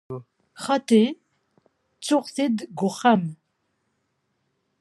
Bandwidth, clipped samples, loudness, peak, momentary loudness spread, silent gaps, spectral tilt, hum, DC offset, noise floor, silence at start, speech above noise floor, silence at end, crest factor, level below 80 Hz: 12.5 kHz; under 0.1%; -22 LUFS; -6 dBFS; 17 LU; none; -5.5 dB/octave; none; under 0.1%; -74 dBFS; 0.1 s; 52 dB; 1.45 s; 20 dB; -76 dBFS